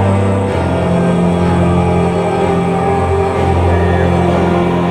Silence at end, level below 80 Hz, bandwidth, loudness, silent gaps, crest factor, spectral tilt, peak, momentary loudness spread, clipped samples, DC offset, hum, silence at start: 0 s; -28 dBFS; 10.5 kHz; -13 LUFS; none; 12 dB; -8 dB/octave; 0 dBFS; 2 LU; under 0.1%; under 0.1%; none; 0 s